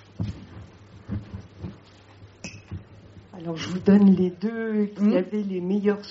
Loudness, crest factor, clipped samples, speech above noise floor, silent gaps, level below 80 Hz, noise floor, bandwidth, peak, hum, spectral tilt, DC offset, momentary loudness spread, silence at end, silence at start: -24 LUFS; 18 dB; under 0.1%; 28 dB; none; -52 dBFS; -49 dBFS; 7.6 kHz; -6 dBFS; none; -8 dB/octave; under 0.1%; 23 LU; 0 s; 0.2 s